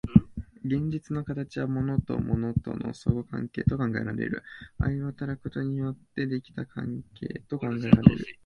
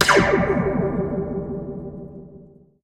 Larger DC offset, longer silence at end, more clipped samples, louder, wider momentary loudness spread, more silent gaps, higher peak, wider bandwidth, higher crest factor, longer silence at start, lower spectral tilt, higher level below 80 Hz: neither; second, 0.1 s vs 0.4 s; neither; second, -29 LUFS vs -22 LUFS; second, 14 LU vs 21 LU; neither; about the same, 0 dBFS vs -2 dBFS; second, 8.6 kHz vs 16 kHz; about the same, 26 dB vs 22 dB; about the same, 0.05 s vs 0 s; first, -9 dB/octave vs -5 dB/octave; about the same, -44 dBFS vs -40 dBFS